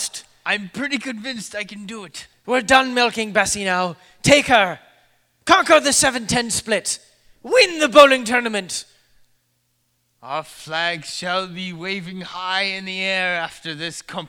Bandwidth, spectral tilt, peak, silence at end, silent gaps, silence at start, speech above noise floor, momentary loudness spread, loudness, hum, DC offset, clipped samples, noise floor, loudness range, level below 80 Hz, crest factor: 18 kHz; -2.5 dB/octave; 0 dBFS; 0 s; none; 0 s; 48 dB; 16 LU; -18 LUFS; none; under 0.1%; under 0.1%; -67 dBFS; 11 LU; -52 dBFS; 20 dB